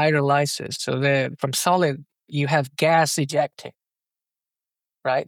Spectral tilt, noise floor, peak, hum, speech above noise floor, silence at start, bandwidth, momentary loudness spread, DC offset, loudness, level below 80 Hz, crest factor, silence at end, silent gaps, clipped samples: -4.5 dB/octave; -89 dBFS; -6 dBFS; none; 68 dB; 0 s; 17.5 kHz; 12 LU; under 0.1%; -22 LUFS; -76 dBFS; 16 dB; 0.05 s; none; under 0.1%